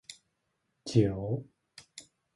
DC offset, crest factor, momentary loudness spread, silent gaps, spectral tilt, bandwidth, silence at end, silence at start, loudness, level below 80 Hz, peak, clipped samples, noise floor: under 0.1%; 24 dB; 23 LU; none; -7 dB/octave; 11.5 kHz; 0.35 s; 0.1 s; -30 LUFS; -58 dBFS; -10 dBFS; under 0.1%; -80 dBFS